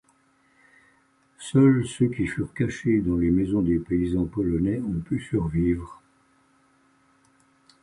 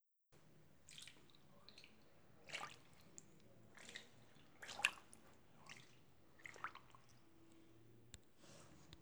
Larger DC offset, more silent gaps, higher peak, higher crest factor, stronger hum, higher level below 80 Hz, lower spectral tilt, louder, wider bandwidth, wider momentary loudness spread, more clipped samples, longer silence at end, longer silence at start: neither; neither; first, -8 dBFS vs -16 dBFS; second, 18 dB vs 40 dB; neither; first, -44 dBFS vs -82 dBFS; first, -8 dB/octave vs -1.5 dB/octave; first, -24 LUFS vs -51 LUFS; second, 11 kHz vs over 20 kHz; second, 9 LU vs 19 LU; neither; first, 1.9 s vs 0 s; first, 1.4 s vs 0 s